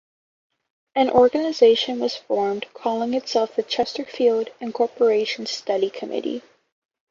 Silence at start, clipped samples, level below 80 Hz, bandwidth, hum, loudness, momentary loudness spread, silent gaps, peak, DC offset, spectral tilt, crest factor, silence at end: 0.95 s; under 0.1%; -62 dBFS; 7.4 kHz; none; -22 LUFS; 11 LU; none; -2 dBFS; under 0.1%; -4 dB/octave; 20 dB; 0.7 s